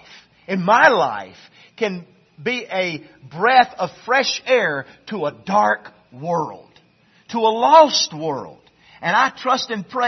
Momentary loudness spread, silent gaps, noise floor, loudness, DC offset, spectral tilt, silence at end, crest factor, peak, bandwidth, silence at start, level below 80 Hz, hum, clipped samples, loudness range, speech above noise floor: 17 LU; none; -56 dBFS; -18 LUFS; under 0.1%; -3.5 dB/octave; 0 s; 20 dB; 0 dBFS; 6.4 kHz; 0.5 s; -66 dBFS; none; under 0.1%; 3 LU; 38 dB